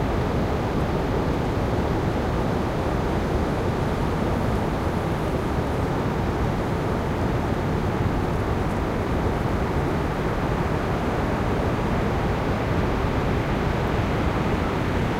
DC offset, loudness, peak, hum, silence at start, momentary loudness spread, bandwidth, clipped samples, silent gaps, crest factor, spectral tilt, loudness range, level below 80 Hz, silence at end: under 0.1%; -24 LUFS; -10 dBFS; none; 0 s; 1 LU; 16 kHz; under 0.1%; none; 12 dB; -7.5 dB/octave; 1 LU; -32 dBFS; 0 s